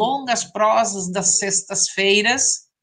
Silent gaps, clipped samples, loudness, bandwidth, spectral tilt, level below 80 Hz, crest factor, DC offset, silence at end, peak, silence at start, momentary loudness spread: none; under 0.1%; -18 LUFS; 11 kHz; -1.5 dB/octave; -64 dBFS; 16 dB; under 0.1%; 0.2 s; -4 dBFS; 0 s; 6 LU